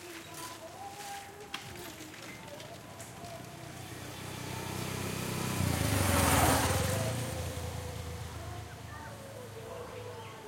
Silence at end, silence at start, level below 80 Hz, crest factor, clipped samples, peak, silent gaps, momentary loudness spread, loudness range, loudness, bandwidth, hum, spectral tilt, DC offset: 0 s; 0 s; -52 dBFS; 22 dB; under 0.1%; -14 dBFS; none; 18 LU; 14 LU; -35 LUFS; 16.5 kHz; none; -4 dB/octave; under 0.1%